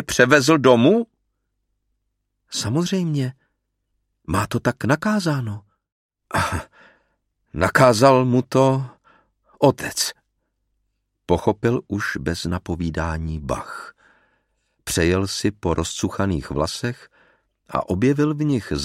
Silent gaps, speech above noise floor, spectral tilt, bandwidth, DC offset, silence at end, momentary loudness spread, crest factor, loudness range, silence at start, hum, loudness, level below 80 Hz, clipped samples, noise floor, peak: 5.92-6.09 s; 55 dB; -5 dB/octave; 16 kHz; under 0.1%; 0 s; 14 LU; 22 dB; 7 LU; 0 s; none; -20 LUFS; -42 dBFS; under 0.1%; -75 dBFS; 0 dBFS